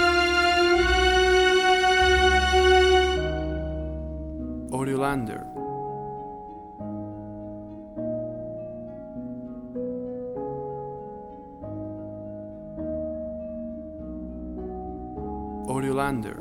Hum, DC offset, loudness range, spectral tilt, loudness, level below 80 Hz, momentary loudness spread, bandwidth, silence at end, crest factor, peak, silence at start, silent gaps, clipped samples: none; under 0.1%; 16 LU; -4.5 dB/octave; -24 LUFS; -38 dBFS; 19 LU; 13.5 kHz; 0 s; 18 dB; -8 dBFS; 0 s; none; under 0.1%